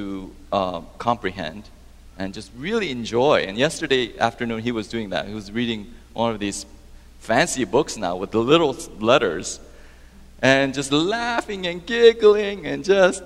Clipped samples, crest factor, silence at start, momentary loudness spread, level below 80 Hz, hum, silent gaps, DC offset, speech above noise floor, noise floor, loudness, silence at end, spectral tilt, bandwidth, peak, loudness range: under 0.1%; 22 dB; 0 s; 15 LU; -46 dBFS; none; none; under 0.1%; 24 dB; -45 dBFS; -21 LUFS; 0 s; -4 dB/octave; 13 kHz; 0 dBFS; 6 LU